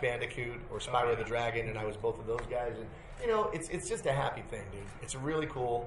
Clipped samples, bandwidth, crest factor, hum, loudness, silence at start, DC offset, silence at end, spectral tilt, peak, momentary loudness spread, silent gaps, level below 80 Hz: under 0.1%; 11.5 kHz; 20 dB; none; -35 LUFS; 0 s; under 0.1%; 0 s; -5 dB/octave; -16 dBFS; 11 LU; none; -50 dBFS